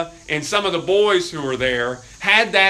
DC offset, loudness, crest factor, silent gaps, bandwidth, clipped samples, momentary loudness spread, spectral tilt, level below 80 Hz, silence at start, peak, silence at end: under 0.1%; -19 LUFS; 18 dB; none; 13.5 kHz; under 0.1%; 9 LU; -3 dB/octave; -48 dBFS; 0 s; 0 dBFS; 0 s